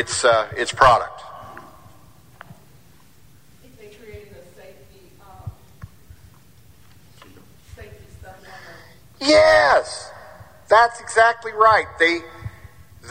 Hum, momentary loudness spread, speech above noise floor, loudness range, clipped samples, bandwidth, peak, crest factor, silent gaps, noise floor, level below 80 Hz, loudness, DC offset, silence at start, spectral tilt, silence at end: none; 27 LU; 36 dB; 7 LU; under 0.1%; 16 kHz; 0 dBFS; 22 dB; none; -52 dBFS; -48 dBFS; -16 LUFS; 0.3%; 0 s; -3 dB/octave; 0 s